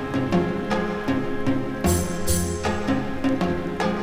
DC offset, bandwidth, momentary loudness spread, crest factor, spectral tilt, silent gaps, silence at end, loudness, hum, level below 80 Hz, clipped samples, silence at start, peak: under 0.1%; 18.5 kHz; 3 LU; 16 dB; -5.5 dB/octave; none; 0 s; -24 LUFS; none; -38 dBFS; under 0.1%; 0 s; -8 dBFS